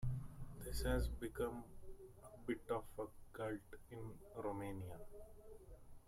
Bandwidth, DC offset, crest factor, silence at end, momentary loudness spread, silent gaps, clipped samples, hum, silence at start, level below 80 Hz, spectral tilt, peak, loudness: 16.5 kHz; under 0.1%; 20 dB; 0 s; 18 LU; none; under 0.1%; none; 0 s; -52 dBFS; -6 dB/octave; -28 dBFS; -47 LUFS